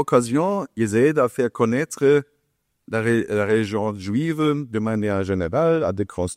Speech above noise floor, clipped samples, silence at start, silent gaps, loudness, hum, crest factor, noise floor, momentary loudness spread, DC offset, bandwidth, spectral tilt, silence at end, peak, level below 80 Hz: 51 dB; under 0.1%; 0 s; none; -21 LUFS; none; 16 dB; -72 dBFS; 6 LU; under 0.1%; 14.5 kHz; -6.5 dB/octave; 0 s; -4 dBFS; -54 dBFS